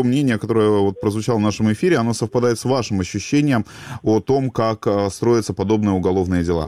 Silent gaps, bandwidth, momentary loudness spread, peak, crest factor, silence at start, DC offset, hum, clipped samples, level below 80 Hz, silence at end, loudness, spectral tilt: none; 14.5 kHz; 3 LU; -6 dBFS; 12 dB; 0 s; 0.2%; none; under 0.1%; -46 dBFS; 0 s; -19 LUFS; -6.5 dB/octave